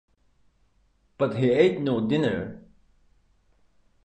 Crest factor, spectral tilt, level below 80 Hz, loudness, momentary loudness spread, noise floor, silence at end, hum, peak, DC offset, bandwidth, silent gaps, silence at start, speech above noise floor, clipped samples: 22 dB; -8 dB/octave; -58 dBFS; -24 LUFS; 10 LU; -65 dBFS; 1.45 s; none; -6 dBFS; under 0.1%; 8.8 kHz; none; 1.2 s; 42 dB; under 0.1%